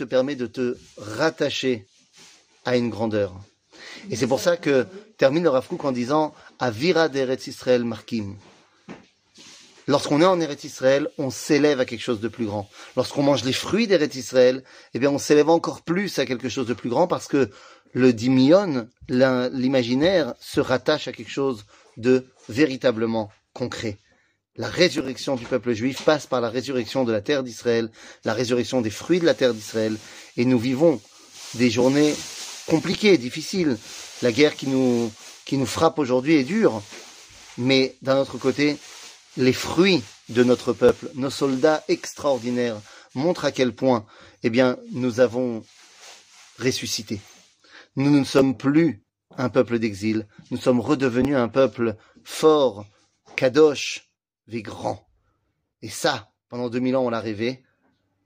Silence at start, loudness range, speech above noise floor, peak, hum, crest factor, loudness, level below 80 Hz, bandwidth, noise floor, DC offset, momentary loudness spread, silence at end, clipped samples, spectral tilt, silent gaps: 0 s; 4 LU; 51 dB; -2 dBFS; none; 20 dB; -22 LUFS; -60 dBFS; 15.5 kHz; -73 dBFS; under 0.1%; 14 LU; 0.7 s; under 0.1%; -5 dB/octave; none